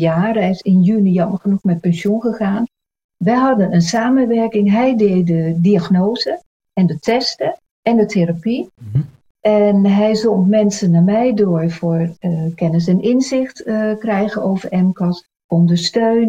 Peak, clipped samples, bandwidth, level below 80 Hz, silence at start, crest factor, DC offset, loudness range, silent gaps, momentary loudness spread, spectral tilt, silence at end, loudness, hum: -2 dBFS; under 0.1%; 9 kHz; -52 dBFS; 0 s; 12 dB; under 0.1%; 3 LU; 3.04-3.09 s, 6.46-6.60 s, 7.71-7.83 s, 9.30-9.35 s, 15.44-15.49 s; 8 LU; -7 dB/octave; 0 s; -16 LUFS; none